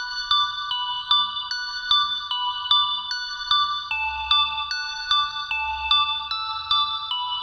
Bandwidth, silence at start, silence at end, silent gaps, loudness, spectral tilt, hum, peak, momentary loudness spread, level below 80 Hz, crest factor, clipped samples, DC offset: over 20 kHz; 0 s; 0 s; none; -22 LUFS; 1.5 dB/octave; none; -6 dBFS; 7 LU; -52 dBFS; 20 dB; under 0.1%; under 0.1%